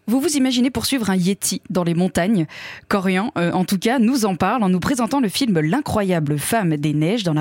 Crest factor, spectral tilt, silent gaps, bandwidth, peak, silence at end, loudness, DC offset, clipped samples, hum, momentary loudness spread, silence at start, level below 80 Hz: 12 dB; -5 dB/octave; none; 17 kHz; -8 dBFS; 0 s; -19 LUFS; under 0.1%; under 0.1%; none; 4 LU; 0.05 s; -50 dBFS